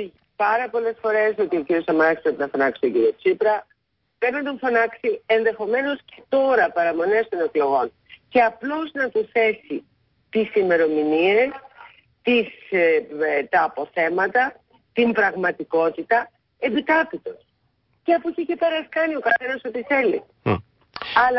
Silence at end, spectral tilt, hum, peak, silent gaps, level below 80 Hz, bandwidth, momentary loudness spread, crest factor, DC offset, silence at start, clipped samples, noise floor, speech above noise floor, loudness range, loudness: 0 s; -9.5 dB/octave; none; -6 dBFS; none; -58 dBFS; 5.8 kHz; 9 LU; 16 dB; under 0.1%; 0 s; under 0.1%; -67 dBFS; 46 dB; 2 LU; -21 LUFS